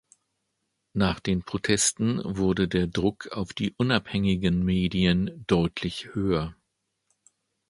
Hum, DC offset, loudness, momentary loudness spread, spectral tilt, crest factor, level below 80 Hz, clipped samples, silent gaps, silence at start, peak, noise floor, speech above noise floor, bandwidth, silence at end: none; under 0.1%; -26 LUFS; 8 LU; -5 dB/octave; 22 dB; -46 dBFS; under 0.1%; none; 0.95 s; -6 dBFS; -78 dBFS; 53 dB; 11.5 kHz; 1.15 s